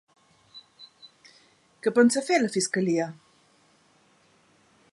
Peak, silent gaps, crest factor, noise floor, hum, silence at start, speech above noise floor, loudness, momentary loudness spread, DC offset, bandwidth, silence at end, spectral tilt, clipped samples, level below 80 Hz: -8 dBFS; none; 20 dB; -62 dBFS; none; 0.55 s; 39 dB; -24 LUFS; 26 LU; under 0.1%; 11.5 kHz; 1.8 s; -4 dB/octave; under 0.1%; -78 dBFS